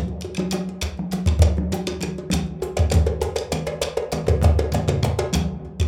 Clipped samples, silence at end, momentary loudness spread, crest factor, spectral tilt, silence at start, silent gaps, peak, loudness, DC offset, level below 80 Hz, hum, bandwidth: under 0.1%; 0 s; 9 LU; 18 dB; -6 dB/octave; 0 s; none; -2 dBFS; -23 LUFS; under 0.1%; -26 dBFS; none; 15.5 kHz